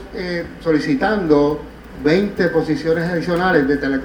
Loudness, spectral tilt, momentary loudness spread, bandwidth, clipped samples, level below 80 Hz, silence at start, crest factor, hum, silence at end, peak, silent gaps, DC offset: -18 LUFS; -7 dB/octave; 9 LU; 20 kHz; under 0.1%; -40 dBFS; 0 s; 16 dB; none; 0 s; 0 dBFS; none; under 0.1%